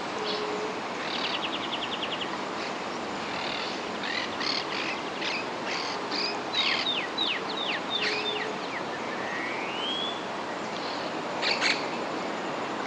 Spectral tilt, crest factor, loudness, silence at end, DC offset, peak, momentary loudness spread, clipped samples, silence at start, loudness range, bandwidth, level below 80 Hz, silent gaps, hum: -2.5 dB/octave; 18 dB; -29 LUFS; 0 s; under 0.1%; -12 dBFS; 7 LU; under 0.1%; 0 s; 3 LU; 12 kHz; -70 dBFS; none; none